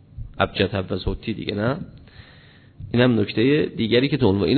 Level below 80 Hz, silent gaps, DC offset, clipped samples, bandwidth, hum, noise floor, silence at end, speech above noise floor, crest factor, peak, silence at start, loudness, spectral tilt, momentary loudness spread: -42 dBFS; none; under 0.1%; under 0.1%; 4.6 kHz; none; -49 dBFS; 0 s; 28 dB; 18 dB; -2 dBFS; 0.15 s; -22 LUFS; -10 dB/octave; 11 LU